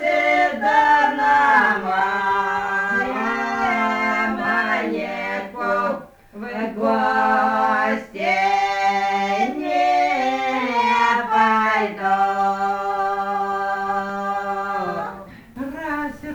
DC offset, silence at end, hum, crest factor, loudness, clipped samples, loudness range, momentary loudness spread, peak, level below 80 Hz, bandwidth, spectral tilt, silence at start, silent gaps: under 0.1%; 0 s; none; 16 dB; -20 LUFS; under 0.1%; 5 LU; 10 LU; -4 dBFS; -56 dBFS; over 20 kHz; -4.5 dB/octave; 0 s; none